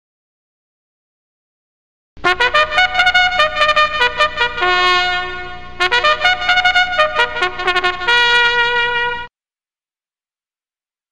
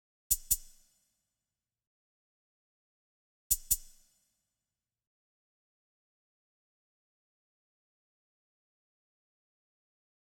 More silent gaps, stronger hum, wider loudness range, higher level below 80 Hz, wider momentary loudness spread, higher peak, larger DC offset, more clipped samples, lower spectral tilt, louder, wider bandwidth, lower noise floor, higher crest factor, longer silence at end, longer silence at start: second, none vs 1.87-3.50 s; neither; about the same, 3 LU vs 3 LU; first, -40 dBFS vs -58 dBFS; first, 7 LU vs 3 LU; first, 0 dBFS vs -12 dBFS; first, 2% vs under 0.1%; neither; first, -2 dB/octave vs 0.5 dB/octave; first, -13 LUFS vs -31 LUFS; second, 13 kHz vs 19 kHz; about the same, under -90 dBFS vs under -90 dBFS; second, 16 dB vs 32 dB; second, 0 s vs 6.35 s; first, 2.15 s vs 0.3 s